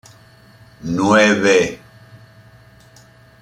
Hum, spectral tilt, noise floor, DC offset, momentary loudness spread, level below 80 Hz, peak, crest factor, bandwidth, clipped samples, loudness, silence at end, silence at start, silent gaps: none; -4.5 dB/octave; -47 dBFS; under 0.1%; 19 LU; -52 dBFS; -2 dBFS; 18 dB; 13 kHz; under 0.1%; -15 LUFS; 1.65 s; 0.85 s; none